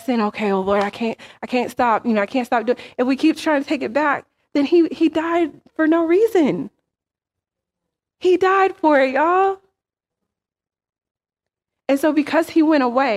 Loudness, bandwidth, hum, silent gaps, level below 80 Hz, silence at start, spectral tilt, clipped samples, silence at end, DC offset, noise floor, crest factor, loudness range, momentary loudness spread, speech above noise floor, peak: -18 LUFS; 14.5 kHz; none; 11.11-11.15 s; -62 dBFS; 0 s; -5.5 dB/octave; under 0.1%; 0 s; under 0.1%; -87 dBFS; 16 dB; 3 LU; 9 LU; 69 dB; -4 dBFS